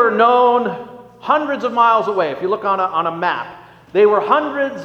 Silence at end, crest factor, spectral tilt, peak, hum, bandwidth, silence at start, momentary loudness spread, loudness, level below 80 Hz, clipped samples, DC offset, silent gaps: 0 s; 16 dB; -6 dB/octave; 0 dBFS; none; 6.8 kHz; 0 s; 13 LU; -16 LUFS; -62 dBFS; under 0.1%; under 0.1%; none